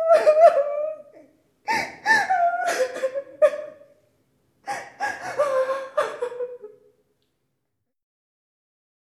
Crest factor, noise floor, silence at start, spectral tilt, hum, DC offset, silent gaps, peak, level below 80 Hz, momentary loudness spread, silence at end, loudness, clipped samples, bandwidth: 20 dB; -79 dBFS; 0 s; -2 dB/octave; none; under 0.1%; none; -4 dBFS; -72 dBFS; 19 LU; 2.35 s; -22 LUFS; under 0.1%; 14 kHz